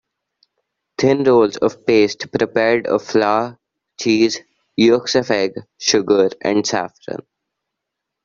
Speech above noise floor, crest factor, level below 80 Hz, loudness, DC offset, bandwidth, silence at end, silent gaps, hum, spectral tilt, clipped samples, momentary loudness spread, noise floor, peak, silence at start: 64 dB; 16 dB; -58 dBFS; -17 LUFS; under 0.1%; 7.6 kHz; 1.1 s; none; none; -4 dB/octave; under 0.1%; 14 LU; -80 dBFS; -2 dBFS; 1 s